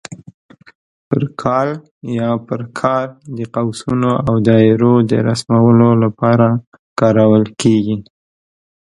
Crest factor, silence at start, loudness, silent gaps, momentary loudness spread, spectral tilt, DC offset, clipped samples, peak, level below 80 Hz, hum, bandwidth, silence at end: 14 dB; 0.1 s; -14 LUFS; 0.34-0.49 s, 0.75-1.11 s, 1.91-2.01 s, 6.67-6.72 s, 6.79-6.96 s; 13 LU; -7.5 dB/octave; under 0.1%; under 0.1%; 0 dBFS; -48 dBFS; none; 11.5 kHz; 0.9 s